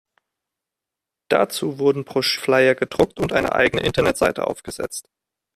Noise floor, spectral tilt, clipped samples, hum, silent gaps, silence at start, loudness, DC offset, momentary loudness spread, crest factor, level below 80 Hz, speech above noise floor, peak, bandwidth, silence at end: -86 dBFS; -4.5 dB/octave; under 0.1%; none; none; 1.3 s; -20 LUFS; under 0.1%; 12 LU; 18 dB; -48 dBFS; 66 dB; -2 dBFS; 14.5 kHz; 0.55 s